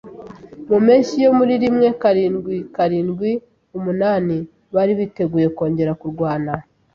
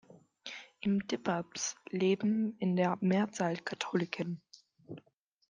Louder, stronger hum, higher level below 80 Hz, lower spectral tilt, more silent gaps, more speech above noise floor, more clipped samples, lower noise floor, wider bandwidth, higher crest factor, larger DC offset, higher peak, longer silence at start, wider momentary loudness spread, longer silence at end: first, -18 LUFS vs -33 LUFS; neither; first, -54 dBFS vs -78 dBFS; first, -8 dB/octave vs -5.5 dB/octave; neither; second, 20 dB vs 40 dB; neither; second, -37 dBFS vs -72 dBFS; second, 7.2 kHz vs 9.6 kHz; about the same, 16 dB vs 18 dB; neither; first, -2 dBFS vs -16 dBFS; about the same, 0.05 s vs 0.1 s; second, 13 LU vs 17 LU; second, 0.35 s vs 0.5 s